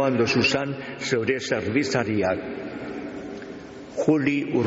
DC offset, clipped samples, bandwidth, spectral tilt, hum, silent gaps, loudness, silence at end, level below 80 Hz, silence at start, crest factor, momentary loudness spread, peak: under 0.1%; under 0.1%; 8 kHz; -4.5 dB/octave; none; none; -24 LUFS; 0 s; -56 dBFS; 0 s; 16 dB; 15 LU; -8 dBFS